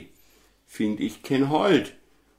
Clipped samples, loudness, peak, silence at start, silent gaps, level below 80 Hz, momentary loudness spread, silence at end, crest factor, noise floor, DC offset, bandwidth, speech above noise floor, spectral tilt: under 0.1%; -24 LUFS; -8 dBFS; 0 s; none; -64 dBFS; 10 LU; 0.5 s; 18 dB; -59 dBFS; under 0.1%; 16 kHz; 35 dB; -6 dB/octave